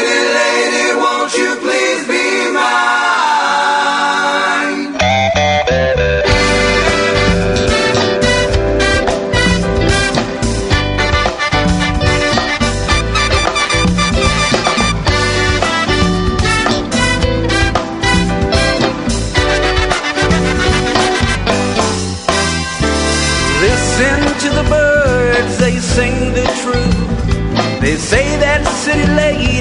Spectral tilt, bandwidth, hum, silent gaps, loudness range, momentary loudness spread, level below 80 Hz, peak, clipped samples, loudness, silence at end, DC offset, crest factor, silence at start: -4 dB/octave; 11 kHz; none; none; 2 LU; 3 LU; -22 dBFS; 0 dBFS; under 0.1%; -13 LUFS; 0 s; under 0.1%; 12 dB; 0 s